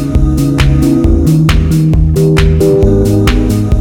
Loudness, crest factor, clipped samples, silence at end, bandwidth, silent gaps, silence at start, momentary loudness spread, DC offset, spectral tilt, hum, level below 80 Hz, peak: -9 LUFS; 8 dB; under 0.1%; 0 s; 18 kHz; none; 0 s; 2 LU; under 0.1%; -7.5 dB/octave; none; -14 dBFS; 0 dBFS